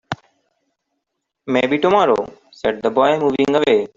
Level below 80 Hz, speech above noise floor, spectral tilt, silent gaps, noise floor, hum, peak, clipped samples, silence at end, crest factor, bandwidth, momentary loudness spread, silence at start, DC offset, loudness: -56 dBFS; 61 dB; -6 dB/octave; none; -77 dBFS; none; -2 dBFS; under 0.1%; 0.1 s; 16 dB; 7.6 kHz; 16 LU; 0.1 s; under 0.1%; -17 LUFS